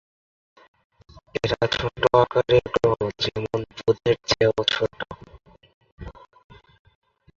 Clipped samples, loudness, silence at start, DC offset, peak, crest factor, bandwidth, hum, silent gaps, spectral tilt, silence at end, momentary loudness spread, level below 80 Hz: under 0.1%; -22 LUFS; 1.15 s; under 0.1%; -4 dBFS; 22 dB; 7.6 kHz; none; 5.74-5.81 s, 5.92-5.98 s; -5 dB/octave; 1.25 s; 20 LU; -48 dBFS